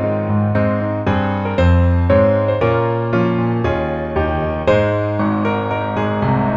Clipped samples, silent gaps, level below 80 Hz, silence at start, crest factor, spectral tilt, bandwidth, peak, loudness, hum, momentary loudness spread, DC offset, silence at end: under 0.1%; none; -32 dBFS; 0 s; 14 dB; -9 dB/octave; 7.4 kHz; -2 dBFS; -17 LUFS; none; 6 LU; under 0.1%; 0 s